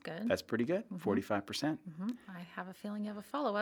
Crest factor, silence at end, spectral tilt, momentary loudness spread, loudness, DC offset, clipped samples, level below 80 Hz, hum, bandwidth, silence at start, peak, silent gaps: 22 dB; 0 s; -5.5 dB/octave; 10 LU; -38 LUFS; under 0.1%; under 0.1%; -78 dBFS; none; over 20 kHz; 0.05 s; -16 dBFS; none